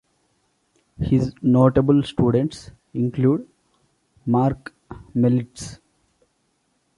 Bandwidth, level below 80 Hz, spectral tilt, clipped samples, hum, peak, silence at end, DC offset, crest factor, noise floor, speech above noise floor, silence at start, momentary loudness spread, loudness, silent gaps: 11.5 kHz; -46 dBFS; -8.5 dB/octave; under 0.1%; none; -2 dBFS; 1.25 s; under 0.1%; 20 dB; -68 dBFS; 49 dB; 1 s; 20 LU; -20 LUFS; none